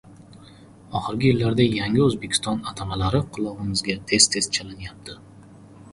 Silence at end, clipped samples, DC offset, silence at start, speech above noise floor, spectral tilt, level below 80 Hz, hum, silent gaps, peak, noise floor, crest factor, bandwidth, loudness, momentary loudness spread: 0 s; under 0.1%; under 0.1%; 0.05 s; 24 dB; -4 dB/octave; -46 dBFS; none; none; -2 dBFS; -47 dBFS; 22 dB; 11.5 kHz; -22 LUFS; 20 LU